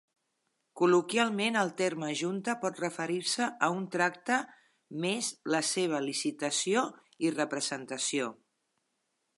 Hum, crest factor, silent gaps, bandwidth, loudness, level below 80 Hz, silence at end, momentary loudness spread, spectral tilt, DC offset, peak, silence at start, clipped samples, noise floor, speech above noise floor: none; 20 dB; none; 11.5 kHz; -31 LUFS; -86 dBFS; 1.05 s; 7 LU; -3 dB/octave; under 0.1%; -12 dBFS; 0.75 s; under 0.1%; -80 dBFS; 49 dB